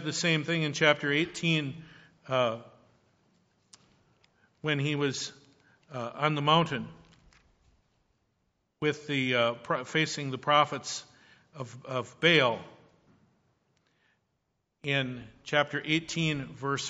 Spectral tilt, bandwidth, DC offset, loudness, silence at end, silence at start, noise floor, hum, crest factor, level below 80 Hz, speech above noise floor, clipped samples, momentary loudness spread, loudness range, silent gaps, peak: -3 dB/octave; 8 kHz; under 0.1%; -29 LUFS; 0 s; 0 s; -79 dBFS; none; 24 dB; -68 dBFS; 50 dB; under 0.1%; 15 LU; 7 LU; none; -8 dBFS